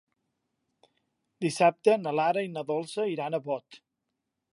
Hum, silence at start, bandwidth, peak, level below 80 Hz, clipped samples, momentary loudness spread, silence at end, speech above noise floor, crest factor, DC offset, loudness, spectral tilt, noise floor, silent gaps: none; 1.4 s; 11.5 kHz; -8 dBFS; -84 dBFS; under 0.1%; 9 LU; 0.8 s; 56 dB; 22 dB; under 0.1%; -28 LUFS; -5.5 dB/octave; -84 dBFS; none